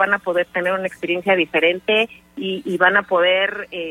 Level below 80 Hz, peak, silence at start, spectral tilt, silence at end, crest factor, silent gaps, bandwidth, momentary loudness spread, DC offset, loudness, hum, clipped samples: -62 dBFS; -2 dBFS; 0 s; -5 dB/octave; 0 s; 16 dB; none; 14 kHz; 10 LU; under 0.1%; -18 LUFS; none; under 0.1%